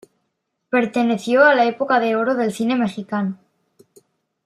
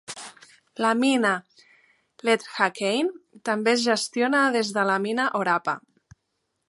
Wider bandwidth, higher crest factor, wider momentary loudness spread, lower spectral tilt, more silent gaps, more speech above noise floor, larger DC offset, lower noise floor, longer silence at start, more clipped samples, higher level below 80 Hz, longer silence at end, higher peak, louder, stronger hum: first, 13 kHz vs 11.5 kHz; about the same, 18 dB vs 20 dB; second, 10 LU vs 13 LU; first, -5.5 dB/octave vs -3.5 dB/octave; neither; about the same, 56 dB vs 53 dB; neither; about the same, -74 dBFS vs -77 dBFS; first, 0.7 s vs 0.1 s; neither; about the same, -70 dBFS vs -74 dBFS; first, 1.1 s vs 0.9 s; about the same, -2 dBFS vs -4 dBFS; first, -18 LUFS vs -24 LUFS; neither